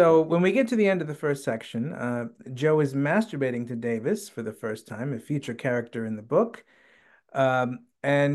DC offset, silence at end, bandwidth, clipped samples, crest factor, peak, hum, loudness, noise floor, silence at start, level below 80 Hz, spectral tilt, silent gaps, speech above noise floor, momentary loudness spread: under 0.1%; 0 s; 12.5 kHz; under 0.1%; 18 dB; -8 dBFS; none; -26 LUFS; -59 dBFS; 0 s; -72 dBFS; -7 dB/octave; none; 34 dB; 11 LU